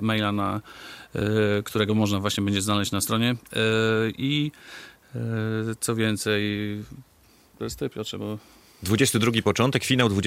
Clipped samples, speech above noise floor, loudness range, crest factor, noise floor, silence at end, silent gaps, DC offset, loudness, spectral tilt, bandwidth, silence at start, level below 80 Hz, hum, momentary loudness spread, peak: under 0.1%; 32 dB; 5 LU; 20 dB; -57 dBFS; 0 s; none; under 0.1%; -25 LUFS; -4.5 dB/octave; 16 kHz; 0 s; -58 dBFS; none; 15 LU; -6 dBFS